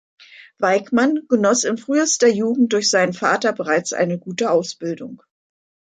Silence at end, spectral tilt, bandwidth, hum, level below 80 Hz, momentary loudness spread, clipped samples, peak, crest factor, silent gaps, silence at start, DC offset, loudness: 0.75 s; -3.5 dB/octave; 9.4 kHz; none; -68 dBFS; 8 LU; under 0.1%; -2 dBFS; 16 dB; none; 0.4 s; under 0.1%; -18 LUFS